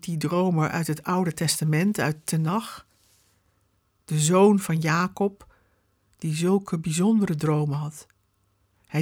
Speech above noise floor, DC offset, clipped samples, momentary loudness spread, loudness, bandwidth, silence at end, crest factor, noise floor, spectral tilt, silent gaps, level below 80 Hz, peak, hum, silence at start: 45 dB; under 0.1%; under 0.1%; 11 LU; -24 LUFS; 18 kHz; 0 s; 18 dB; -68 dBFS; -5.5 dB/octave; none; -62 dBFS; -8 dBFS; none; 0.05 s